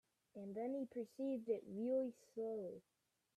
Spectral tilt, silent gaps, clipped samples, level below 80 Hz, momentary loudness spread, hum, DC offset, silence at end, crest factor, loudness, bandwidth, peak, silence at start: -8 dB/octave; none; under 0.1%; -90 dBFS; 12 LU; none; under 0.1%; 0.55 s; 16 dB; -45 LUFS; 13.5 kHz; -30 dBFS; 0.35 s